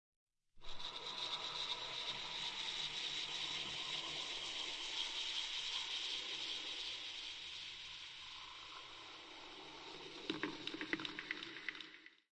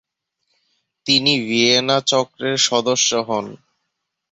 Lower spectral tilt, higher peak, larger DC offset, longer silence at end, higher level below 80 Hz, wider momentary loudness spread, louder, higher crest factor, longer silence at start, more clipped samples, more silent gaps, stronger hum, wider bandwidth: second, -1 dB/octave vs -2.5 dB/octave; second, -22 dBFS vs -2 dBFS; neither; second, 0.15 s vs 0.75 s; about the same, -68 dBFS vs -64 dBFS; about the same, 12 LU vs 10 LU; second, -43 LUFS vs -17 LUFS; first, 24 dB vs 18 dB; second, 0.55 s vs 1.05 s; neither; neither; neither; first, 10 kHz vs 8.2 kHz